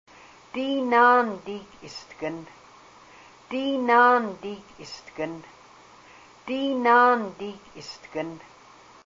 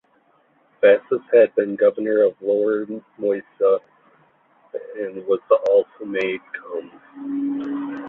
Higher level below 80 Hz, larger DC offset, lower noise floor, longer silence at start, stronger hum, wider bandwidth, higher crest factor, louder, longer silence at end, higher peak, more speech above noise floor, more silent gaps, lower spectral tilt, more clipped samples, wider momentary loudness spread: about the same, -66 dBFS vs -70 dBFS; neither; second, -51 dBFS vs -60 dBFS; second, 0.55 s vs 0.8 s; neither; first, 7.6 kHz vs 4.1 kHz; about the same, 18 dB vs 18 dB; second, -23 LUFS vs -20 LUFS; first, 0.7 s vs 0 s; second, -8 dBFS vs -2 dBFS; second, 27 dB vs 40 dB; neither; second, -4.5 dB/octave vs -7.5 dB/octave; neither; first, 23 LU vs 16 LU